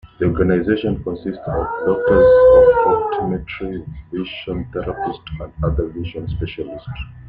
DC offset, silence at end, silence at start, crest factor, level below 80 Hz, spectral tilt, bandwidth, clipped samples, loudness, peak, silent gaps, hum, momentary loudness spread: under 0.1%; 0 s; 0.05 s; 16 dB; -34 dBFS; -10 dB/octave; 4.7 kHz; under 0.1%; -17 LUFS; -2 dBFS; none; none; 19 LU